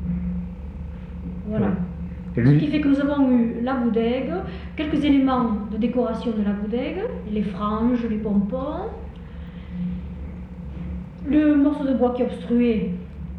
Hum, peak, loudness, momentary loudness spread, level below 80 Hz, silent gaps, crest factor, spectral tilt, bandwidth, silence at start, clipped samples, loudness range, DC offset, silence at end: none; -6 dBFS; -23 LUFS; 16 LU; -38 dBFS; none; 16 dB; -9.5 dB/octave; 5.8 kHz; 0 s; under 0.1%; 5 LU; under 0.1%; 0 s